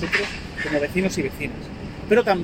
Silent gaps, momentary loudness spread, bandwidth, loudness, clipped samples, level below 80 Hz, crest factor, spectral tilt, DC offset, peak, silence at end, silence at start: none; 14 LU; 16.5 kHz; -23 LUFS; under 0.1%; -42 dBFS; 18 dB; -5 dB/octave; under 0.1%; -4 dBFS; 0 s; 0 s